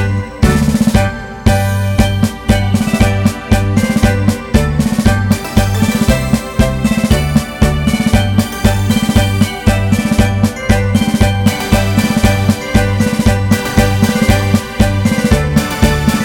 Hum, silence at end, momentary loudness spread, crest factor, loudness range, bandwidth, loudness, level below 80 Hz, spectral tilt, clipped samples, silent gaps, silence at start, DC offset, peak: none; 0 s; 3 LU; 12 dB; 1 LU; 19 kHz; -13 LUFS; -20 dBFS; -6 dB/octave; 0.4%; none; 0 s; 0.4%; 0 dBFS